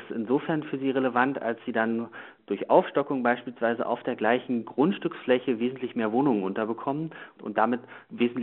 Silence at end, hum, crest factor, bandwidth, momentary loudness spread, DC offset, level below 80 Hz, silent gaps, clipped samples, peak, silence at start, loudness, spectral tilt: 0 s; none; 20 dB; 4.2 kHz; 9 LU; under 0.1%; -76 dBFS; none; under 0.1%; -6 dBFS; 0 s; -27 LUFS; -4.5 dB/octave